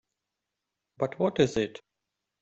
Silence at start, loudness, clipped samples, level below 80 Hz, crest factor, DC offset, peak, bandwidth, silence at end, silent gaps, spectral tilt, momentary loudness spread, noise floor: 1 s; -29 LUFS; under 0.1%; -62 dBFS; 22 dB; under 0.1%; -10 dBFS; 8.2 kHz; 0.65 s; none; -6 dB/octave; 9 LU; -86 dBFS